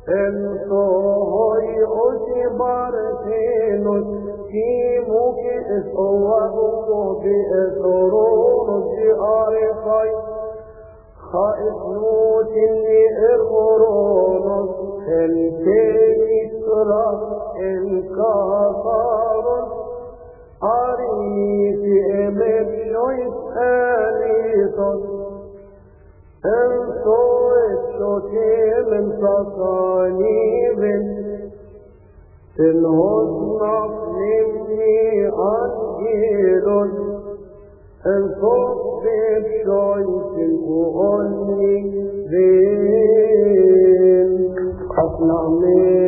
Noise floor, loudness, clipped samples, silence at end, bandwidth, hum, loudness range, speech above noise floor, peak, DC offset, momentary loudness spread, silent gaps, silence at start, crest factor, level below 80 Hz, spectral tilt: -46 dBFS; -18 LUFS; under 0.1%; 0 s; 2.7 kHz; none; 5 LU; 29 dB; -4 dBFS; under 0.1%; 9 LU; none; 0 s; 14 dB; -46 dBFS; -15 dB/octave